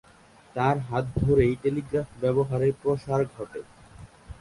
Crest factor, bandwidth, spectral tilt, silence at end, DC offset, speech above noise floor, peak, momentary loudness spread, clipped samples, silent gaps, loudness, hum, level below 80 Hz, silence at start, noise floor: 18 dB; 11.5 kHz; -8.5 dB/octave; 0.05 s; under 0.1%; 29 dB; -8 dBFS; 16 LU; under 0.1%; none; -26 LUFS; none; -46 dBFS; 0.55 s; -54 dBFS